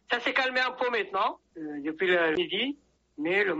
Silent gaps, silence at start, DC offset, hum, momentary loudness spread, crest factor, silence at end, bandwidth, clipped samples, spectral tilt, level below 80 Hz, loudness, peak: none; 0.1 s; under 0.1%; none; 11 LU; 18 dB; 0 s; 8 kHz; under 0.1%; -0.5 dB/octave; -70 dBFS; -28 LUFS; -12 dBFS